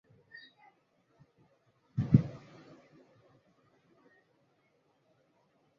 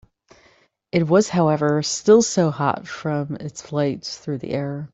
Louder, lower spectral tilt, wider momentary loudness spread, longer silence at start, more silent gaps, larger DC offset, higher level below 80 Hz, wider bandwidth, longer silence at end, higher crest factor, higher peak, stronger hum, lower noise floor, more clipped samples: second, -31 LUFS vs -21 LUFS; first, -10 dB/octave vs -5.5 dB/octave; first, 27 LU vs 13 LU; first, 1.95 s vs 0.95 s; neither; neither; about the same, -60 dBFS vs -60 dBFS; second, 6.4 kHz vs 8.4 kHz; first, 3.4 s vs 0.05 s; first, 30 dB vs 18 dB; second, -8 dBFS vs -4 dBFS; neither; first, -73 dBFS vs -58 dBFS; neither